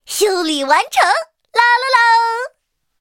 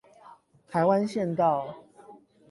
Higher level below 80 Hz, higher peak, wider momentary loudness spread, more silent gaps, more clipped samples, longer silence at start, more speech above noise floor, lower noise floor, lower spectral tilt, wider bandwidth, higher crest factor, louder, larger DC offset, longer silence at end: about the same, -66 dBFS vs -70 dBFS; first, 0 dBFS vs -10 dBFS; second, 8 LU vs 14 LU; neither; neither; second, 0.1 s vs 0.25 s; first, 51 dB vs 29 dB; first, -65 dBFS vs -54 dBFS; second, 1 dB/octave vs -7.5 dB/octave; first, 17 kHz vs 11.5 kHz; about the same, 16 dB vs 18 dB; first, -14 LUFS vs -26 LUFS; neither; first, 0.55 s vs 0.35 s